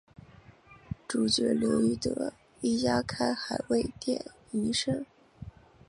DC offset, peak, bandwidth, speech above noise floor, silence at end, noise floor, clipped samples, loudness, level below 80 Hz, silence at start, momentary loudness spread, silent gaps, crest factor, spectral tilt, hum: under 0.1%; -12 dBFS; 11.5 kHz; 26 dB; 0.4 s; -55 dBFS; under 0.1%; -30 LUFS; -56 dBFS; 0.7 s; 18 LU; none; 18 dB; -4.5 dB/octave; none